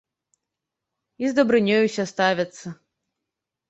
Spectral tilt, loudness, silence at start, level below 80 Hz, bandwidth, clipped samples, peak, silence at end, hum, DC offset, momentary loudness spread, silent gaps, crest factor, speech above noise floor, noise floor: -5 dB/octave; -21 LUFS; 1.2 s; -66 dBFS; 8.2 kHz; under 0.1%; -4 dBFS; 0.95 s; none; under 0.1%; 14 LU; none; 20 dB; 63 dB; -85 dBFS